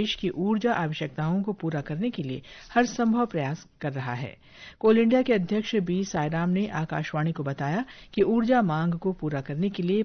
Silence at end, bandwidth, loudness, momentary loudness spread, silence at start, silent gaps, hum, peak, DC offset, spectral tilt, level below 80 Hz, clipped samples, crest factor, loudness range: 0 s; 6.6 kHz; -27 LUFS; 11 LU; 0 s; none; none; -8 dBFS; under 0.1%; -6.5 dB/octave; -56 dBFS; under 0.1%; 18 dB; 3 LU